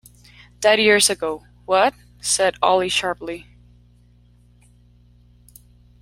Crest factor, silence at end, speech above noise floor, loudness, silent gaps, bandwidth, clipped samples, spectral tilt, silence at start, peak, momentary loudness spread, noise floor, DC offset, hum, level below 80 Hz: 20 dB; 2.6 s; 34 dB; -18 LUFS; none; 16 kHz; under 0.1%; -1.5 dB/octave; 0.6 s; -2 dBFS; 16 LU; -53 dBFS; under 0.1%; 60 Hz at -50 dBFS; -52 dBFS